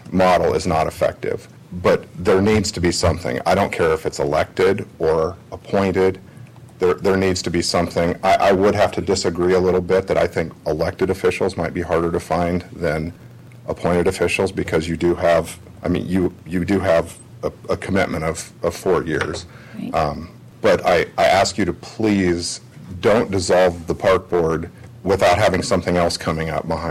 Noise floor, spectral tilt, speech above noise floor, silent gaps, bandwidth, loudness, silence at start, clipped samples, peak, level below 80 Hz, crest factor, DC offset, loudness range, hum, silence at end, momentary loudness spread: -40 dBFS; -5.5 dB/octave; 22 dB; none; 15.5 kHz; -19 LUFS; 0 s; under 0.1%; -8 dBFS; -42 dBFS; 12 dB; under 0.1%; 4 LU; none; 0 s; 10 LU